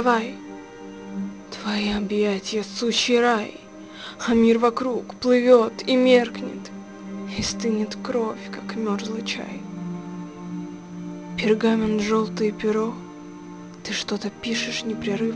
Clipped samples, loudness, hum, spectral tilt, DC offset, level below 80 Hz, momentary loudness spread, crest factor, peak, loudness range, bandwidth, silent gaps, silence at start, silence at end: under 0.1%; -23 LUFS; none; -4.5 dB/octave; under 0.1%; -54 dBFS; 19 LU; 20 dB; -4 dBFS; 8 LU; 10 kHz; none; 0 s; 0 s